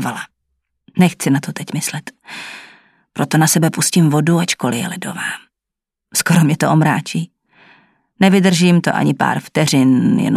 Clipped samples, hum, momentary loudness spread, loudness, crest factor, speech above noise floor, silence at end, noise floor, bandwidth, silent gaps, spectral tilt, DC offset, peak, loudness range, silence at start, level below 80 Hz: under 0.1%; none; 17 LU; -15 LUFS; 16 dB; 68 dB; 0 s; -83 dBFS; 15.5 kHz; none; -5 dB/octave; under 0.1%; 0 dBFS; 3 LU; 0 s; -60 dBFS